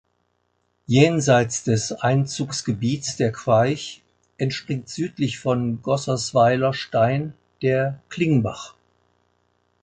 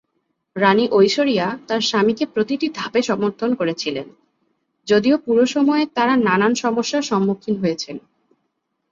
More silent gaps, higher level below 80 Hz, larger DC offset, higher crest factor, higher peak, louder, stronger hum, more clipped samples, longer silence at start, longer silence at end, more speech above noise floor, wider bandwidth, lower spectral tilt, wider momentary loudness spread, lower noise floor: neither; first, -56 dBFS vs -62 dBFS; neither; about the same, 20 dB vs 16 dB; about the same, -2 dBFS vs -2 dBFS; second, -22 LUFS vs -18 LUFS; first, 60 Hz at -45 dBFS vs none; neither; first, 0.9 s vs 0.55 s; first, 1.1 s vs 0.95 s; second, 49 dB vs 55 dB; first, 9.4 kHz vs 7.6 kHz; about the same, -5.5 dB/octave vs -5 dB/octave; about the same, 11 LU vs 9 LU; about the same, -70 dBFS vs -73 dBFS